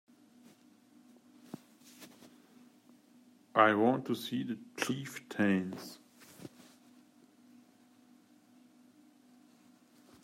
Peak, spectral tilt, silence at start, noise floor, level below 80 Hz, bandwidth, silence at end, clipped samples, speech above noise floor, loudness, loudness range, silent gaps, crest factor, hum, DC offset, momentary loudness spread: -10 dBFS; -5.5 dB/octave; 2 s; -64 dBFS; -84 dBFS; 16 kHz; 3.75 s; under 0.1%; 32 dB; -32 LUFS; 7 LU; none; 28 dB; none; under 0.1%; 27 LU